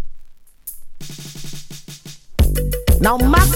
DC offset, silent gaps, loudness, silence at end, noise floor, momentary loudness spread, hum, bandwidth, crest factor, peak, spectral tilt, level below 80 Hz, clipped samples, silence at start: under 0.1%; none; -17 LUFS; 0 s; -37 dBFS; 22 LU; none; 17 kHz; 18 dB; 0 dBFS; -5 dB/octave; -22 dBFS; under 0.1%; 0 s